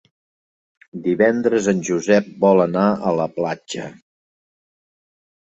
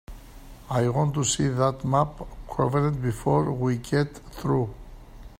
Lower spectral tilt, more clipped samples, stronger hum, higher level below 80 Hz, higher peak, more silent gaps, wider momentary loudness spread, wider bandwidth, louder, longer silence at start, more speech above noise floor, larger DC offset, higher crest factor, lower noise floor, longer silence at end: about the same, -6 dB/octave vs -6 dB/octave; neither; neither; second, -62 dBFS vs -44 dBFS; first, -2 dBFS vs -6 dBFS; neither; first, 14 LU vs 8 LU; second, 8.2 kHz vs 16 kHz; first, -18 LUFS vs -25 LUFS; first, 0.95 s vs 0.1 s; first, over 72 dB vs 20 dB; neither; about the same, 18 dB vs 18 dB; first, under -90 dBFS vs -45 dBFS; first, 1.65 s vs 0.05 s